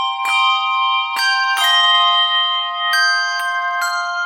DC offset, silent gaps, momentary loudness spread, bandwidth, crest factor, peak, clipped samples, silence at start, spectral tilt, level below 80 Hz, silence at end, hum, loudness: under 0.1%; none; 8 LU; 17 kHz; 12 dB; -4 dBFS; under 0.1%; 0 s; 5 dB/octave; -80 dBFS; 0 s; none; -14 LUFS